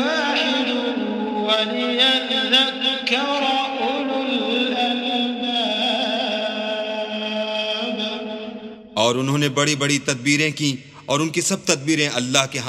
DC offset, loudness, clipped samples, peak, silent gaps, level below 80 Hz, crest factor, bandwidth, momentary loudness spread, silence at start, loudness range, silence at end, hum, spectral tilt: under 0.1%; -20 LUFS; under 0.1%; 0 dBFS; none; -66 dBFS; 22 dB; 16 kHz; 8 LU; 0 s; 4 LU; 0 s; none; -3 dB/octave